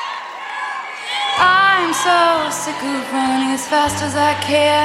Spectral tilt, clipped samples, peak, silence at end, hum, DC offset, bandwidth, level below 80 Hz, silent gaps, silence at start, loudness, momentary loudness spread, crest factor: -2.5 dB/octave; under 0.1%; -2 dBFS; 0 s; none; under 0.1%; 16 kHz; -50 dBFS; none; 0 s; -16 LUFS; 13 LU; 14 dB